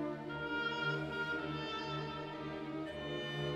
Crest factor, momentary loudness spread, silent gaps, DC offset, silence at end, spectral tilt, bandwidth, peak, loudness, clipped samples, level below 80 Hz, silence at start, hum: 14 dB; 6 LU; none; under 0.1%; 0 s; -6 dB/octave; 12 kHz; -26 dBFS; -40 LUFS; under 0.1%; -64 dBFS; 0 s; none